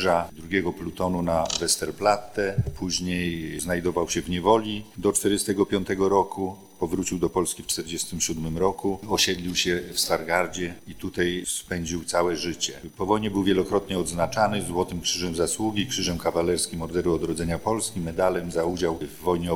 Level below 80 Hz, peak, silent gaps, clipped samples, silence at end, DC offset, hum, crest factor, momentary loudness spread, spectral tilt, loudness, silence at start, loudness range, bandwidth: -46 dBFS; -6 dBFS; none; under 0.1%; 0 s; under 0.1%; none; 20 dB; 7 LU; -4 dB/octave; -25 LUFS; 0 s; 2 LU; 19 kHz